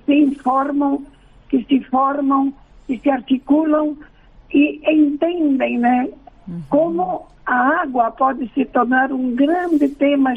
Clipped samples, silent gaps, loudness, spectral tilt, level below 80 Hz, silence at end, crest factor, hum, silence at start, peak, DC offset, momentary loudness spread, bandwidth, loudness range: under 0.1%; none; -18 LUFS; -7.5 dB/octave; -50 dBFS; 0 s; 12 dB; none; 0.1 s; -6 dBFS; under 0.1%; 8 LU; 3.7 kHz; 1 LU